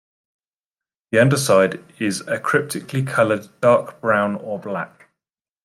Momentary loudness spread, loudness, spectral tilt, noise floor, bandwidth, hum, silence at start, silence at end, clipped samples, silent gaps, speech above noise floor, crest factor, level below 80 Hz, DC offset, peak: 11 LU; -19 LUFS; -5 dB/octave; under -90 dBFS; 15 kHz; none; 1.1 s; 0.75 s; under 0.1%; none; over 71 dB; 18 dB; -64 dBFS; under 0.1%; -2 dBFS